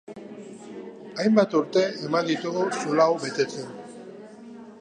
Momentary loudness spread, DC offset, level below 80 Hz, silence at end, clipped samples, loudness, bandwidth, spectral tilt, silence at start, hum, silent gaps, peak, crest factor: 22 LU; under 0.1%; -76 dBFS; 0 s; under 0.1%; -24 LUFS; 10 kHz; -5 dB/octave; 0.1 s; none; none; -4 dBFS; 22 dB